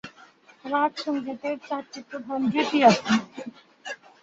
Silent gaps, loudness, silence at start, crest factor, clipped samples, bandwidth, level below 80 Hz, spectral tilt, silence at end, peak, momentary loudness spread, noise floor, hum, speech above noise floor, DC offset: none; -24 LUFS; 0.05 s; 24 dB; under 0.1%; 8 kHz; -68 dBFS; -5 dB/octave; 0.25 s; -2 dBFS; 22 LU; -53 dBFS; none; 29 dB; under 0.1%